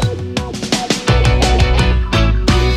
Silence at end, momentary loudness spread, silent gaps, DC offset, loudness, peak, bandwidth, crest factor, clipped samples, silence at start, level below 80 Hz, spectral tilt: 0 s; 8 LU; none; under 0.1%; -15 LUFS; 0 dBFS; 13 kHz; 12 dB; under 0.1%; 0 s; -16 dBFS; -5 dB/octave